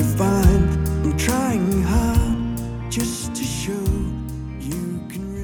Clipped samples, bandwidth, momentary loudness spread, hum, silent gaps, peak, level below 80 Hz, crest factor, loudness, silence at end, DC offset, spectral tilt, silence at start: under 0.1%; over 20 kHz; 12 LU; none; none; -2 dBFS; -26 dBFS; 18 dB; -22 LUFS; 0 s; under 0.1%; -6 dB/octave; 0 s